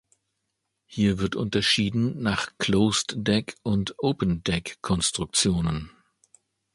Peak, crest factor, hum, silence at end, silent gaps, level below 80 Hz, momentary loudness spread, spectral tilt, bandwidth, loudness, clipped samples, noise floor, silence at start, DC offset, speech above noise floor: -8 dBFS; 18 dB; none; 0.85 s; none; -46 dBFS; 7 LU; -4 dB/octave; 11.5 kHz; -25 LUFS; under 0.1%; -79 dBFS; 0.9 s; under 0.1%; 54 dB